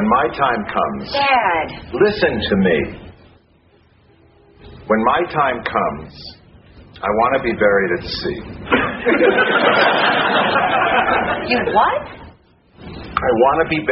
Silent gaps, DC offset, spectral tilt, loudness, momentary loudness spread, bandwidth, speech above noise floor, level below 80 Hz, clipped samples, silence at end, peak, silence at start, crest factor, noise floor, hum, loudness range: none; under 0.1%; -2.5 dB/octave; -16 LUFS; 12 LU; 5.8 kHz; 37 dB; -42 dBFS; under 0.1%; 0 s; -2 dBFS; 0 s; 16 dB; -53 dBFS; none; 7 LU